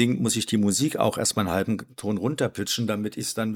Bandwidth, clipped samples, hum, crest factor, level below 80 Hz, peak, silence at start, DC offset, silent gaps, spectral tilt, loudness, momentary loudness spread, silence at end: 18 kHz; under 0.1%; none; 18 dB; -62 dBFS; -8 dBFS; 0 s; under 0.1%; none; -4.5 dB/octave; -25 LUFS; 6 LU; 0 s